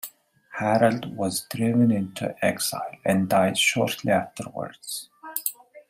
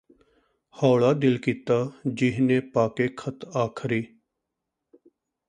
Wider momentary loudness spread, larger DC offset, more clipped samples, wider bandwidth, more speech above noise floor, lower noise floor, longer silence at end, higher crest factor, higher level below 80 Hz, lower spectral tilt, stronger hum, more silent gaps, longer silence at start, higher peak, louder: first, 13 LU vs 10 LU; neither; neither; first, 16 kHz vs 9.8 kHz; second, 23 dB vs 60 dB; second, -47 dBFS vs -83 dBFS; second, 0.1 s vs 1.4 s; about the same, 20 dB vs 20 dB; about the same, -66 dBFS vs -64 dBFS; second, -4.5 dB/octave vs -7.5 dB/octave; neither; neither; second, 0.05 s vs 0.8 s; about the same, -4 dBFS vs -6 dBFS; about the same, -24 LUFS vs -25 LUFS